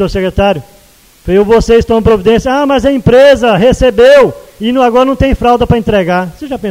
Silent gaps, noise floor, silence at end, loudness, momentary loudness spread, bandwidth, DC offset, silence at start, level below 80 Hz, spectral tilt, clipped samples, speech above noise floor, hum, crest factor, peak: none; -42 dBFS; 0 s; -8 LUFS; 9 LU; 16 kHz; under 0.1%; 0 s; -24 dBFS; -6.5 dB/octave; 1%; 34 dB; none; 8 dB; 0 dBFS